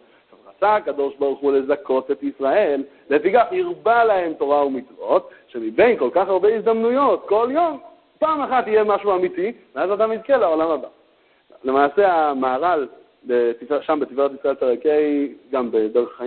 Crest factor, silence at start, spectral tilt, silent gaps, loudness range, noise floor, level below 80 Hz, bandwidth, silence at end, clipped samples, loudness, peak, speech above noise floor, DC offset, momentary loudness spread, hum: 16 dB; 0.6 s; -10 dB/octave; none; 2 LU; -58 dBFS; -62 dBFS; 4.4 kHz; 0 s; under 0.1%; -20 LUFS; -2 dBFS; 39 dB; under 0.1%; 8 LU; none